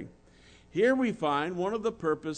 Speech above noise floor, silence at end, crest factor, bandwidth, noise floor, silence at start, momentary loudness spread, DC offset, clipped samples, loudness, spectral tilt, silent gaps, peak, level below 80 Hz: 29 dB; 0 s; 16 dB; 9.4 kHz; -57 dBFS; 0 s; 8 LU; under 0.1%; under 0.1%; -29 LUFS; -6 dB/octave; none; -14 dBFS; -62 dBFS